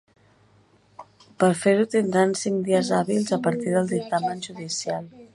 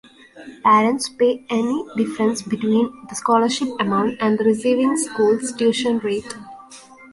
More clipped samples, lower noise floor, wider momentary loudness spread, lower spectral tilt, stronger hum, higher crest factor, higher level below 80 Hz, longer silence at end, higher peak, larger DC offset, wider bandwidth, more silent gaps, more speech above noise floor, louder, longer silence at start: neither; first, -58 dBFS vs -43 dBFS; about the same, 9 LU vs 9 LU; about the same, -5 dB/octave vs -4.5 dB/octave; neither; about the same, 20 dB vs 16 dB; second, -68 dBFS vs -62 dBFS; about the same, 0.1 s vs 0.05 s; about the same, -4 dBFS vs -4 dBFS; neither; about the same, 11.5 kHz vs 11.5 kHz; neither; first, 36 dB vs 24 dB; second, -23 LUFS vs -19 LUFS; first, 1 s vs 0.35 s